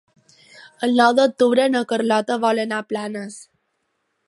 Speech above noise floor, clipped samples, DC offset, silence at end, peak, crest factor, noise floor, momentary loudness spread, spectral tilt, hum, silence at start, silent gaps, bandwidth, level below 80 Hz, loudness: 53 dB; under 0.1%; under 0.1%; 0.85 s; -2 dBFS; 20 dB; -72 dBFS; 14 LU; -4 dB/octave; none; 0.6 s; none; 11.5 kHz; -76 dBFS; -19 LUFS